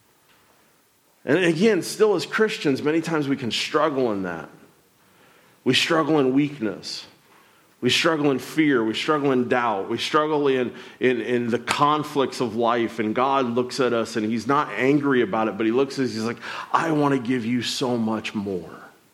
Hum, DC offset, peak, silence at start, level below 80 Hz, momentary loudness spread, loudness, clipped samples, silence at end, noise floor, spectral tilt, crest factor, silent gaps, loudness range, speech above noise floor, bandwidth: none; under 0.1%; -6 dBFS; 1.25 s; -70 dBFS; 9 LU; -22 LUFS; under 0.1%; 0.25 s; -61 dBFS; -5 dB/octave; 16 dB; none; 3 LU; 39 dB; 15.5 kHz